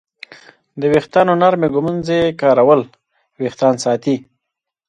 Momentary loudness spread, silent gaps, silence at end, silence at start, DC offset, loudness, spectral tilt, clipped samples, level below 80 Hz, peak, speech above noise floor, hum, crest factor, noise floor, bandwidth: 10 LU; none; 0.7 s; 0.75 s; under 0.1%; -15 LUFS; -6 dB/octave; under 0.1%; -54 dBFS; 0 dBFS; 66 dB; none; 16 dB; -80 dBFS; 10.5 kHz